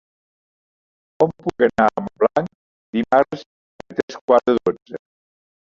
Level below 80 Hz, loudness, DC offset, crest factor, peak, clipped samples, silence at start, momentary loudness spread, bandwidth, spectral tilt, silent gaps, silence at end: -56 dBFS; -20 LUFS; under 0.1%; 20 dB; -2 dBFS; under 0.1%; 1.2 s; 16 LU; 7.6 kHz; -7 dB/octave; 2.55-2.93 s, 3.46-3.79 s, 4.03-4.08 s, 4.21-4.28 s, 4.82-4.86 s; 0.8 s